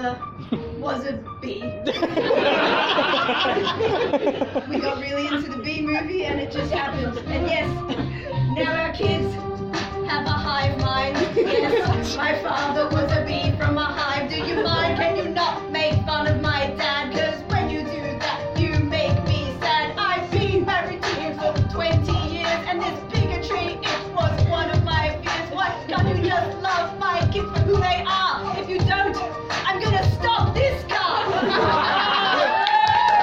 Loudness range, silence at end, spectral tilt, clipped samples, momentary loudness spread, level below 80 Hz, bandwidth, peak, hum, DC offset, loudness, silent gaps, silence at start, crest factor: 3 LU; 0 s; -6 dB/octave; under 0.1%; 7 LU; -40 dBFS; 7.8 kHz; -2 dBFS; none; under 0.1%; -22 LUFS; none; 0 s; 20 dB